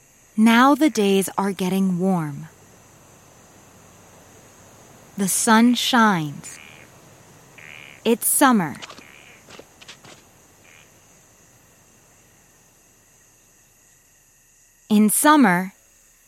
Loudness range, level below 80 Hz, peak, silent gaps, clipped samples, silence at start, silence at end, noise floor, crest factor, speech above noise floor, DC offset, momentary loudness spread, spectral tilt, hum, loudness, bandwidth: 9 LU; -66 dBFS; -2 dBFS; none; under 0.1%; 0.35 s; 0.6 s; -56 dBFS; 20 dB; 38 dB; under 0.1%; 25 LU; -4 dB/octave; none; -18 LUFS; 16.5 kHz